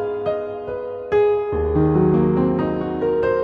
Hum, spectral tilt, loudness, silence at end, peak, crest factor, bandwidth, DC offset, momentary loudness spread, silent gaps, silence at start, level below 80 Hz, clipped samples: none; -10.5 dB/octave; -20 LUFS; 0 s; -4 dBFS; 14 dB; 5.2 kHz; under 0.1%; 11 LU; none; 0 s; -36 dBFS; under 0.1%